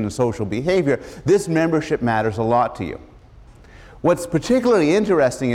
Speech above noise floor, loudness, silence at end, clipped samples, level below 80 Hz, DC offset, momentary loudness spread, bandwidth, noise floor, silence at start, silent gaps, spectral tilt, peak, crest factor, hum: 26 dB; -19 LUFS; 0 s; under 0.1%; -46 dBFS; under 0.1%; 7 LU; 15.5 kHz; -45 dBFS; 0 s; none; -6.5 dB/octave; -6 dBFS; 14 dB; none